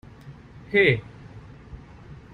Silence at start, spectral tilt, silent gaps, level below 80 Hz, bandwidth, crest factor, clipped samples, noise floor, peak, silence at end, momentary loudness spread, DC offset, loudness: 0.25 s; -7.5 dB/octave; none; -50 dBFS; 9.8 kHz; 22 dB; under 0.1%; -45 dBFS; -6 dBFS; 0.2 s; 26 LU; under 0.1%; -21 LUFS